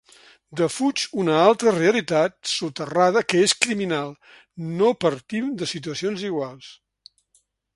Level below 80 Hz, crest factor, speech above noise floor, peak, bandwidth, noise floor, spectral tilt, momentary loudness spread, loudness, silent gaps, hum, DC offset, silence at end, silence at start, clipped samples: -66 dBFS; 22 dB; 44 dB; -2 dBFS; 11.5 kHz; -66 dBFS; -4 dB/octave; 11 LU; -22 LUFS; none; none; under 0.1%; 1 s; 0.5 s; under 0.1%